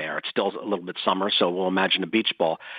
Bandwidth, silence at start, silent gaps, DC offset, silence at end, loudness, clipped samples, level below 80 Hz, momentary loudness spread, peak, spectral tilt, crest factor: 5.2 kHz; 0 s; none; under 0.1%; 0 s; -24 LUFS; under 0.1%; -80 dBFS; 6 LU; -6 dBFS; -7.5 dB/octave; 20 dB